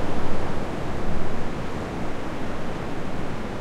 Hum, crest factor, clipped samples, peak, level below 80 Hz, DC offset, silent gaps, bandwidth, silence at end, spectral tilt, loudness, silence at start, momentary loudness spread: none; 14 dB; under 0.1%; -6 dBFS; -32 dBFS; under 0.1%; none; 8.2 kHz; 0 s; -6.5 dB/octave; -31 LUFS; 0 s; 2 LU